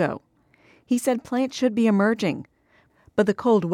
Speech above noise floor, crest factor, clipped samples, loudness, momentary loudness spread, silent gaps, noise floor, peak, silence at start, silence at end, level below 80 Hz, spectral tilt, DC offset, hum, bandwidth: 39 dB; 16 dB; under 0.1%; -23 LUFS; 8 LU; none; -61 dBFS; -6 dBFS; 0 s; 0 s; -64 dBFS; -6 dB/octave; under 0.1%; none; 16 kHz